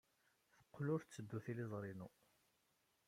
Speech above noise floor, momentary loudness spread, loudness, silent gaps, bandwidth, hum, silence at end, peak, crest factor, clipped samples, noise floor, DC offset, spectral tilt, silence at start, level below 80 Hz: 36 dB; 14 LU; -48 LUFS; none; 16 kHz; none; 1 s; -32 dBFS; 18 dB; under 0.1%; -82 dBFS; under 0.1%; -7.5 dB/octave; 0.75 s; -86 dBFS